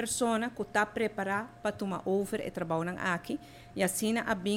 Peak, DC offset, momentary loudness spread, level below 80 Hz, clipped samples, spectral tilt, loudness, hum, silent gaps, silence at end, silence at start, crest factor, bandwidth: -14 dBFS; under 0.1%; 6 LU; -62 dBFS; under 0.1%; -4 dB/octave; -32 LUFS; none; none; 0 s; 0 s; 18 dB; 16.5 kHz